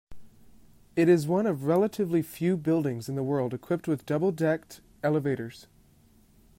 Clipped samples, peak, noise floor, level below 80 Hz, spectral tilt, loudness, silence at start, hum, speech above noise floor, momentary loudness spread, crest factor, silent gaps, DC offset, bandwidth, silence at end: under 0.1%; -12 dBFS; -60 dBFS; -62 dBFS; -7.5 dB/octave; -27 LUFS; 0.1 s; none; 33 dB; 9 LU; 16 dB; none; under 0.1%; 16 kHz; 0.95 s